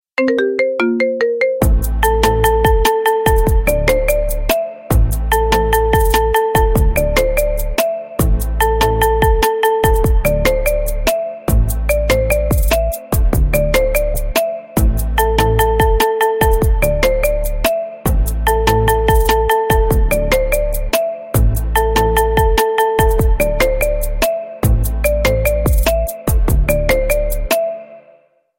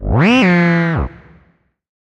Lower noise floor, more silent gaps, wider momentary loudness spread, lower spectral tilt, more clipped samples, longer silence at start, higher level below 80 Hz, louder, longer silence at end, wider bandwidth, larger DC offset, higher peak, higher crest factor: second, -50 dBFS vs -56 dBFS; neither; second, 4 LU vs 11 LU; second, -5 dB/octave vs -7 dB/octave; neither; first, 0.2 s vs 0 s; first, -18 dBFS vs -30 dBFS; about the same, -15 LUFS vs -13 LUFS; second, 0.6 s vs 1.05 s; first, 17 kHz vs 7.8 kHz; neither; about the same, 0 dBFS vs -2 dBFS; about the same, 14 dB vs 12 dB